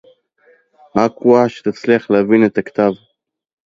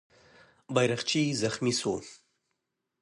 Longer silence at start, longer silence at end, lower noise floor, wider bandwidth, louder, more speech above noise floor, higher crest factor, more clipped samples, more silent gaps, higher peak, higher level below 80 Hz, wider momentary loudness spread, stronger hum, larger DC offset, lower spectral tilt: first, 0.95 s vs 0.7 s; about the same, 0.75 s vs 0.85 s; second, -54 dBFS vs -82 dBFS; second, 7.6 kHz vs 11.5 kHz; first, -15 LUFS vs -29 LUFS; second, 40 dB vs 54 dB; second, 16 dB vs 22 dB; neither; neither; first, 0 dBFS vs -10 dBFS; first, -58 dBFS vs -66 dBFS; about the same, 8 LU vs 8 LU; neither; neither; first, -7.5 dB/octave vs -4 dB/octave